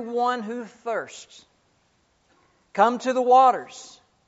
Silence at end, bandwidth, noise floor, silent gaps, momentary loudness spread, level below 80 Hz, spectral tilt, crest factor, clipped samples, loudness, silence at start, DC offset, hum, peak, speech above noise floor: 0.4 s; 8 kHz; -66 dBFS; none; 23 LU; -76 dBFS; -2.5 dB/octave; 20 dB; under 0.1%; -22 LUFS; 0 s; under 0.1%; none; -6 dBFS; 43 dB